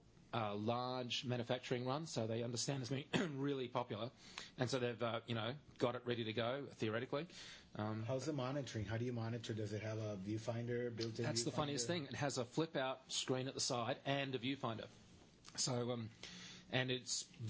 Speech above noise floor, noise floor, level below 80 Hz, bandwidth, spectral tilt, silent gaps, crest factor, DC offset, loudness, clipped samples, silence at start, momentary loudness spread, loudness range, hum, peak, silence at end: 21 dB; -63 dBFS; -72 dBFS; 8 kHz; -4.5 dB/octave; none; 24 dB; under 0.1%; -42 LUFS; under 0.1%; 0.25 s; 7 LU; 3 LU; none; -20 dBFS; 0 s